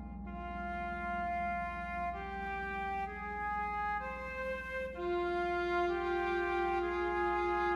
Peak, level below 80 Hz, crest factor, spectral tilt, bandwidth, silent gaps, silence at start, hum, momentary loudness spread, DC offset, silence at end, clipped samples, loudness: -22 dBFS; -50 dBFS; 14 dB; -6.5 dB/octave; 7.8 kHz; none; 0 s; 60 Hz at -50 dBFS; 7 LU; under 0.1%; 0 s; under 0.1%; -36 LUFS